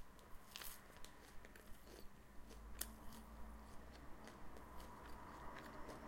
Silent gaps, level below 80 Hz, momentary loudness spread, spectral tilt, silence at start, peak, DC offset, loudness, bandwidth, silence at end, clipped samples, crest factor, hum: none; -62 dBFS; 11 LU; -3.5 dB/octave; 0 s; -22 dBFS; under 0.1%; -57 LUFS; 16.5 kHz; 0 s; under 0.1%; 32 dB; none